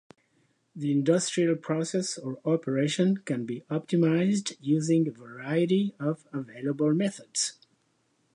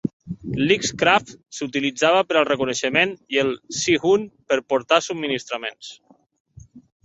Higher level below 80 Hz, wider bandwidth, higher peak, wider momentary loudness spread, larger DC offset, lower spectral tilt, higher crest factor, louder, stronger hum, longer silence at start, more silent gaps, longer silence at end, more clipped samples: second, -78 dBFS vs -56 dBFS; first, 11 kHz vs 8.2 kHz; second, -10 dBFS vs -2 dBFS; second, 9 LU vs 12 LU; neither; first, -5.5 dB/octave vs -3.5 dB/octave; about the same, 16 dB vs 20 dB; second, -28 LUFS vs -21 LUFS; neither; first, 0.75 s vs 0.05 s; second, none vs 0.13-0.20 s, 6.40-6.45 s; first, 0.85 s vs 0.25 s; neither